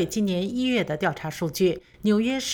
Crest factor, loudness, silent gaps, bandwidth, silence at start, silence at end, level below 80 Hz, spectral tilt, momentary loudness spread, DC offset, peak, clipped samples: 14 dB; -25 LUFS; none; 19.5 kHz; 0 s; 0 s; -54 dBFS; -5 dB/octave; 5 LU; under 0.1%; -10 dBFS; under 0.1%